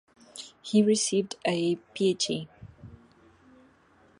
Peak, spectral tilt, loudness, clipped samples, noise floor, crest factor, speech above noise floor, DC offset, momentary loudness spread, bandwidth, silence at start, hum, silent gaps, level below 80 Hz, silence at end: -10 dBFS; -4 dB/octave; -27 LUFS; under 0.1%; -61 dBFS; 20 dB; 34 dB; under 0.1%; 23 LU; 11.5 kHz; 0.35 s; none; none; -66 dBFS; 1.25 s